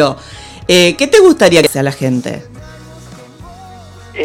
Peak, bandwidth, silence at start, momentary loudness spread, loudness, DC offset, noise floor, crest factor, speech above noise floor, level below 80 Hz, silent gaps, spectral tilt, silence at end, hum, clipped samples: 0 dBFS; 18 kHz; 0 s; 21 LU; -10 LUFS; under 0.1%; -34 dBFS; 12 dB; 24 dB; -42 dBFS; none; -4.5 dB/octave; 0 s; none; 0.5%